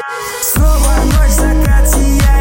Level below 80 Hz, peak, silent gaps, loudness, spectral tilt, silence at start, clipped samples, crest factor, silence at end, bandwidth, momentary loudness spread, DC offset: -10 dBFS; 0 dBFS; none; -12 LUFS; -5 dB/octave; 0 s; under 0.1%; 8 dB; 0 s; 17 kHz; 3 LU; under 0.1%